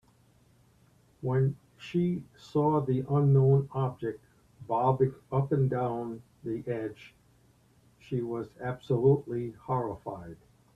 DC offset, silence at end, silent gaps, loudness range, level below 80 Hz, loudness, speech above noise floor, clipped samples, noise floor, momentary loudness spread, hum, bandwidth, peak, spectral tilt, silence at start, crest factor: under 0.1%; 0.4 s; none; 6 LU; -62 dBFS; -30 LUFS; 35 dB; under 0.1%; -63 dBFS; 15 LU; none; 5.6 kHz; -12 dBFS; -10 dB/octave; 1.2 s; 18 dB